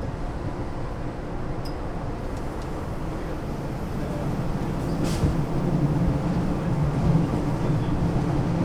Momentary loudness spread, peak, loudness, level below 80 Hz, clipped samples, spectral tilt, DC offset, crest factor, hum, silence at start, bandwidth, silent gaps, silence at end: 9 LU; -10 dBFS; -27 LUFS; -34 dBFS; under 0.1%; -8 dB/octave; under 0.1%; 16 dB; none; 0 s; 14 kHz; none; 0 s